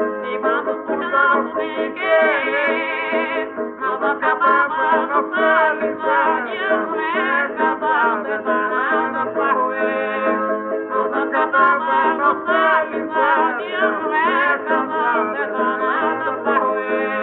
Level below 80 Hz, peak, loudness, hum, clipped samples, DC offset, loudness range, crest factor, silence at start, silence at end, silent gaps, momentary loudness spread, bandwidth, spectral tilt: -68 dBFS; -4 dBFS; -18 LUFS; none; under 0.1%; under 0.1%; 2 LU; 14 dB; 0 s; 0 s; none; 6 LU; 4.6 kHz; -1 dB/octave